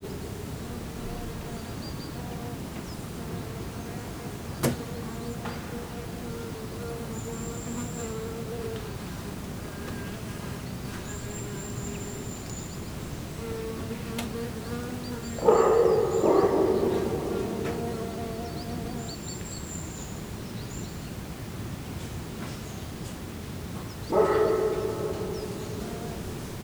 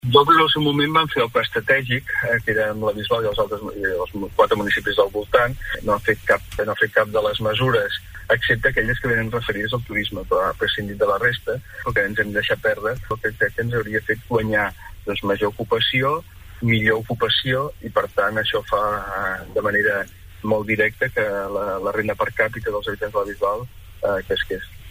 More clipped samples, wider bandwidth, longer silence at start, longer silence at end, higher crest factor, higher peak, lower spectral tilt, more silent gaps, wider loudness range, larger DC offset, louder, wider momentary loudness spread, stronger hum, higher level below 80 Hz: neither; first, over 20 kHz vs 16 kHz; about the same, 0 s vs 0.05 s; about the same, 0 s vs 0 s; about the same, 24 dB vs 20 dB; second, -8 dBFS vs -2 dBFS; about the same, -5.5 dB/octave vs -5.5 dB/octave; neither; first, 12 LU vs 2 LU; neither; second, -31 LUFS vs -21 LUFS; first, 14 LU vs 8 LU; neither; about the same, -46 dBFS vs -42 dBFS